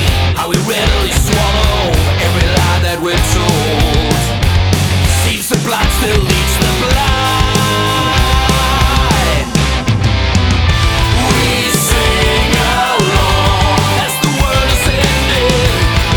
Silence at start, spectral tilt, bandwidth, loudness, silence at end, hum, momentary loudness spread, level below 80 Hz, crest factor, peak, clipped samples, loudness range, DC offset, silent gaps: 0 s; -4 dB/octave; over 20 kHz; -12 LUFS; 0 s; none; 2 LU; -18 dBFS; 12 dB; 0 dBFS; under 0.1%; 1 LU; under 0.1%; none